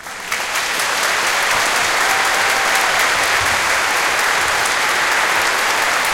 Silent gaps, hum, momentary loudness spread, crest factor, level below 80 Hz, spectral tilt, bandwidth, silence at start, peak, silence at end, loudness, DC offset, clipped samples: none; none; 3 LU; 16 dB; -48 dBFS; 0 dB/octave; 17 kHz; 0 s; -2 dBFS; 0 s; -15 LUFS; under 0.1%; under 0.1%